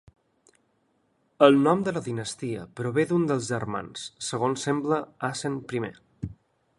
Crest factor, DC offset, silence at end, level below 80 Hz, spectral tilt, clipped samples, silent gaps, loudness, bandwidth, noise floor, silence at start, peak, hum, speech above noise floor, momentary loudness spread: 24 dB; under 0.1%; 0.45 s; -60 dBFS; -5.5 dB/octave; under 0.1%; none; -26 LUFS; 11.5 kHz; -70 dBFS; 1.4 s; -2 dBFS; none; 44 dB; 17 LU